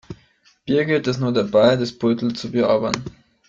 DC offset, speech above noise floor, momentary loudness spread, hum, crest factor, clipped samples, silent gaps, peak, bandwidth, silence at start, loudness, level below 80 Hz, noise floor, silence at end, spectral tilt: under 0.1%; 38 dB; 10 LU; none; 20 dB; under 0.1%; none; -2 dBFS; 7.8 kHz; 0.1 s; -20 LUFS; -54 dBFS; -57 dBFS; 0.4 s; -6 dB/octave